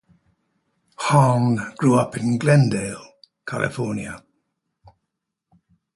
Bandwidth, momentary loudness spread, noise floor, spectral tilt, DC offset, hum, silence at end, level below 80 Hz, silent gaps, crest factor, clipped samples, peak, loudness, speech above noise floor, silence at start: 11.5 kHz; 17 LU; -80 dBFS; -6.5 dB/octave; under 0.1%; none; 1.75 s; -56 dBFS; none; 20 dB; under 0.1%; -2 dBFS; -20 LUFS; 61 dB; 1 s